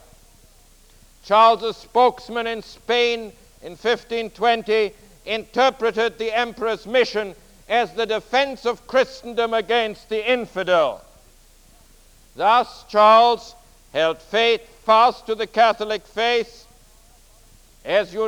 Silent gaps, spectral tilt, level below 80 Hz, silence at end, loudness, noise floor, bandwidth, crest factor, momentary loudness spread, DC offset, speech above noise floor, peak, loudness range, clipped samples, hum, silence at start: none; -3.5 dB/octave; -52 dBFS; 0 s; -20 LUFS; -51 dBFS; 17.5 kHz; 18 dB; 12 LU; under 0.1%; 31 dB; -2 dBFS; 5 LU; under 0.1%; none; 1.25 s